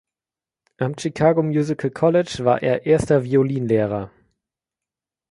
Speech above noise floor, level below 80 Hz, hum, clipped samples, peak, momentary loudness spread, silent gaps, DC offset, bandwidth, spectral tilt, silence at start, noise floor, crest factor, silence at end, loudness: over 71 dB; -50 dBFS; none; under 0.1%; -2 dBFS; 8 LU; none; under 0.1%; 11.5 kHz; -7 dB/octave; 0.8 s; under -90 dBFS; 18 dB; 1.25 s; -20 LUFS